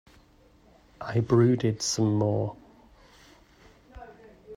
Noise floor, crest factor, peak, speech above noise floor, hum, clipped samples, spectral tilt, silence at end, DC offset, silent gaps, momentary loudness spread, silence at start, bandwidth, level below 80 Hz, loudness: -58 dBFS; 20 dB; -10 dBFS; 34 dB; none; under 0.1%; -6 dB/octave; 0 s; under 0.1%; none; 26 LU; 1 s; 12 kHz; -58 dBFS; -26 LUFS